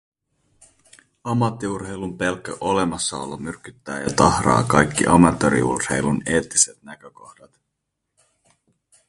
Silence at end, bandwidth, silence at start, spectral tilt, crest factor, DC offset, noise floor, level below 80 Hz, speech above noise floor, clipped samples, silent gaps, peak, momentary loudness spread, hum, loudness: 2 s; 11.5 kHz; 1.25 s; -4.5 dB/octave; 22 dB; under 0.1%; -78 dBFS; -44 dBFS; 58 dB; under 0.1%; none; 0 dBFS; 16 LU; none; -20 LUFS